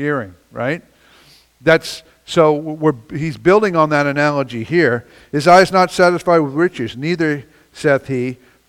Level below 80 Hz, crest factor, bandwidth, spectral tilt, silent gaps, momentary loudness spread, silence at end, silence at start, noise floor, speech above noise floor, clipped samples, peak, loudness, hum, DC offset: -52 dBFS; 16 dB; 15.5 kHz; -6 dB/octave; none; 12 LU; 0.35 s; 0 s; -49 dBFS; 34 dB; under 0.1%; 0 dBFS; -16 LUFS; none; under 0.1%